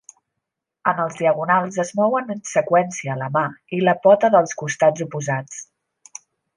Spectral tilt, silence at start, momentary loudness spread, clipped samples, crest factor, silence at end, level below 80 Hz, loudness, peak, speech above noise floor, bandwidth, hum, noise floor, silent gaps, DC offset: -5.5 dB/octave; 0.85 s; 17 LU; under 0.1%; 18 dB; 0.95 s; -70 dBFS; -20 LUFS; -2 dBFS; 62 dB; 10.5 kHz; none; -81 dBFS; none; under 0.1%